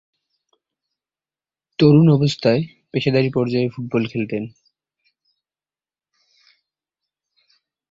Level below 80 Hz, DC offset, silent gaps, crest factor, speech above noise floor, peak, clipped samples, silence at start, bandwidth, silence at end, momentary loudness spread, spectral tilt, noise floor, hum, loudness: -58 dBFS; under 0.1%; none; 20 dB; over 73 dB; -2 dBFS; under 0.1%; 1.8 s; 7.6 kHz; 3.45 s; 13 LU; -8 dB/octave; under -90 dBFS; none; -18 LUFS